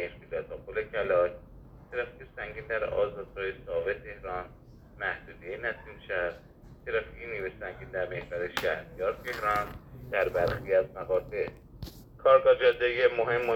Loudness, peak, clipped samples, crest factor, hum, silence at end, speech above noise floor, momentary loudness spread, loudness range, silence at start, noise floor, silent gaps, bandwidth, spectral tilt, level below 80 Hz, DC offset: -30 LUFS; -10 dBFS; under 0.1%; 22 dB; none; 0 s; 20 dB; 15 LU; 9 LU; 0 s; -49 dBFS; none; 17 kHz; -5.5 dB/octave; -52 dBFS; under 0.1%